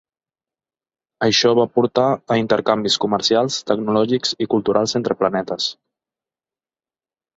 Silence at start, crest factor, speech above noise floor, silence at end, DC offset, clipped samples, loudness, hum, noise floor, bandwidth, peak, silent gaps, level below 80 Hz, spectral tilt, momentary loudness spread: 1.2 s; 18 dB; over 72 dB; 1.65 s; under 0.1%; under 0.1%; -18 LUFS; none; under -90 dBFS; 8 kHz; -2 dBFS; none; -60 dBFS; -4 dB/octave; 6 LU